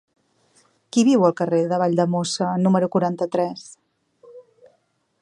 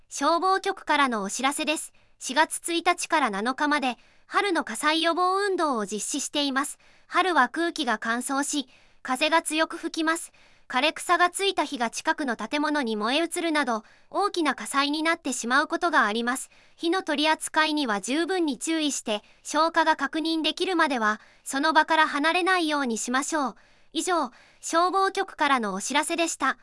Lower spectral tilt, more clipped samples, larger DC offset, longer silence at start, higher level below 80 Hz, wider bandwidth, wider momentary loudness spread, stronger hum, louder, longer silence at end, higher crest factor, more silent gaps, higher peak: first, -6 dB/octave vs -2 dB/octave; neither; neither; first, 0.95 s vs 0.1 s; second, -72 dBFS vs -66 dBFS; about the same, 11 kHz vs 12 kHz; about the same, 7 LU vs 8 LU; neither; first, -20 LUFS vs -25 LUFS; first, 0.8 s vs 0.1 s; about the same, 18 dB vs 20 dB; neither; about the same, -4 dBFS vs -6 dBFS